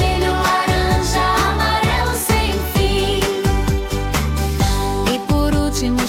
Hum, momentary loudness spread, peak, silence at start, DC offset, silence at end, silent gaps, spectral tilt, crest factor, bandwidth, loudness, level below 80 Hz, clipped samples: none; 4 LU; -4 dBFS; 0 s; under 0.1%; 0 s; none; -4.5 dB/octave; 12 dB; 17.5 kHz; -17 LUFS; -24 dBFS; under 0.1%